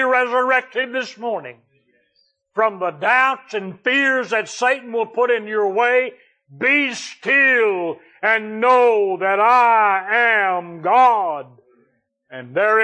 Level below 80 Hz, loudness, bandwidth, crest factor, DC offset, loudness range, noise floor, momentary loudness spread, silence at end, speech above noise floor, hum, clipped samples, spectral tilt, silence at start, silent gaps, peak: -84 dBFS; -17 LUFS; 9.2 kHz; 14 dB; under 0.1%; 5 LU; -64 dBFS; 13 LU; 0 s; 47 dB; none; under 0.1%; -3.5 dB/octave; 0 s; none; -4 dBFS